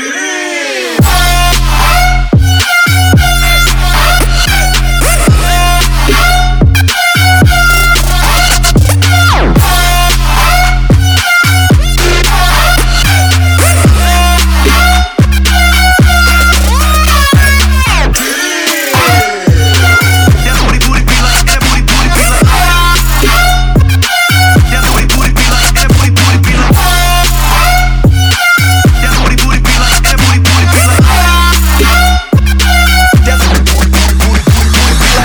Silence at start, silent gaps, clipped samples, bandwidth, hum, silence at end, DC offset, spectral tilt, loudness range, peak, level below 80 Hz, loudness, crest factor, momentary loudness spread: 0 s; none; 0.6%; over 20 kHz; none; 0 s; under 0.1%; -4 dB/octave; 1 LU; 0 dBFS; -10 dBFS; -7 LUFS; 6 dB; 3 LU